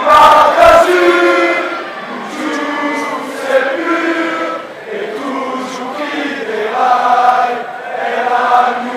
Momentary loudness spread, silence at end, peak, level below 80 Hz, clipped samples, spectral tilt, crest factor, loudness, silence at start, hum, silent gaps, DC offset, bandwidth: 15 LU; 0 s; 0 dBFS; -44 dBFS; 0.3%; -3.5 dB/octave; 12 dB; -12 LUFS; 0 s; none; none; under 0.1%; 16 kHz